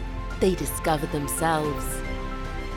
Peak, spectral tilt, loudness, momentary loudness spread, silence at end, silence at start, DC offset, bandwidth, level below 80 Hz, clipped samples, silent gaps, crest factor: -10 dBFS; -4.5 dB/octave; -27 LUFS; 9 LU; 0 s; 0 s; under 0.1%; 19 kHz; -34 dBFS; under 0.1%; none; 16 dB